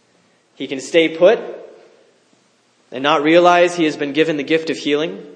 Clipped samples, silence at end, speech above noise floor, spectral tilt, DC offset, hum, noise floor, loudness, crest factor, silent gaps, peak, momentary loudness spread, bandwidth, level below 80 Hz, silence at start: under 0.1%; 0.05 s; 42 dB; -4.5 dB/octave; under 0.1%; none; -58 dBFS; -16 LUFS; 18 dB; none; 0 dBFS; 17 LU; 9.8 kHz; -76 dBFS; 0.6 s